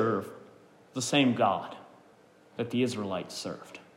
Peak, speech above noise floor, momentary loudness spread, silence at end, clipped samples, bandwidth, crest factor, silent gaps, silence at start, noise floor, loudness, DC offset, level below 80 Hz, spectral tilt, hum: -12 dBFS; 29 dB; 20 LU; 0.15 s; under 0.1%; 16 kHz; 20 dB; none; 0 s; -59 dBFS; -30 LUFS; under 0.1%; -80 dBFS; -4.5 dB/octave; none